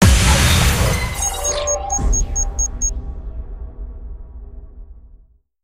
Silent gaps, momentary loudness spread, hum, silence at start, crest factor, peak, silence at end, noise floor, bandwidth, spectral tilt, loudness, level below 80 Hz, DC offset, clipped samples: none; 23 LU; none; 0 s; 18 dB; 0 dBFS; 0.5 s; -48 dBFS; 16.5 kHz; -3.5 dB/octave; -17 LUFS; -22 dBFS; under 0.1%; under 0.1%